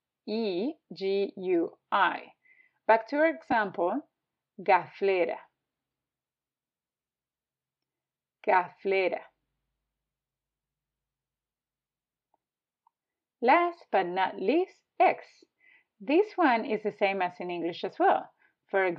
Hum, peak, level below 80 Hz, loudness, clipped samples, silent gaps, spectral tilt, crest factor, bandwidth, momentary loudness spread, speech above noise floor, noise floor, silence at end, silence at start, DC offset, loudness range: none; -10 dBFS; -82 dBFS; -28 LUFS; under 0.1%; none; -7 dB/octave; 22 dB; 6.2 kHz; 11 LU; over 63 dB; under -90 dBFS; 0 s; 0.25 s; under 0.1%; 7 LU